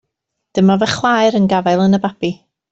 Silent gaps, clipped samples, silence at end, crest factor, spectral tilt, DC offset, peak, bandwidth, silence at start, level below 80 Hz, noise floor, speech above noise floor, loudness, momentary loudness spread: none; under 0.1%; 0.4 s; 12 dB; -6 dB/octave; under 0.1%; -2 dBFS; 8 kHz; 0.55 s; -54 dBFS; -76 dBFS; 62 dB; -15 LUFS; 10 LU